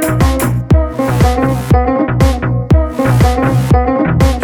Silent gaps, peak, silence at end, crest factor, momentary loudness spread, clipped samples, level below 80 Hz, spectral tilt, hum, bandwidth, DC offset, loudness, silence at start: none; 0 dBFS; 0 s; 10 dB; 3 LU; under 0.1%; -16 dBFS; -7 dB/octave; none; 19 kHz; under 0.1%; -12 LUFS; 0 s